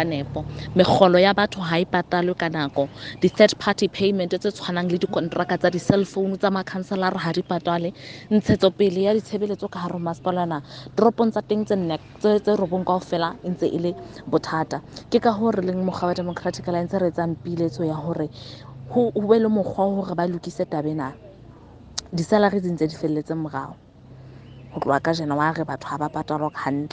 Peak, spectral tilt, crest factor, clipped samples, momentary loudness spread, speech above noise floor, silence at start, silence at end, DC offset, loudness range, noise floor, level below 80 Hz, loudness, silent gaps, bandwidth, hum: 0 dBFS; -6.5 dB/octave; 22 dB; under 0.1%; 10 LU; 23 dB; 0 s; 0.05 s; under 0.1%; 5 LU; -45 dBFS; -54 dBFS; -23 LUFS; none; 9.4 kHz; none